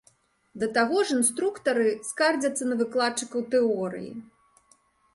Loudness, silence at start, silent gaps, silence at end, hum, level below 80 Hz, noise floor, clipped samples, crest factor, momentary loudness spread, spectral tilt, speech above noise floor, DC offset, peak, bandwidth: -25 LUFS; 0.55 s; none; 0.9 s; none; -70 dBFS; -64 dBFS; under 0.1%; 18 dB; 9 LU; -3 dB/octave; 38 dB; under 0.1%; -10 dBFS; 12 kHz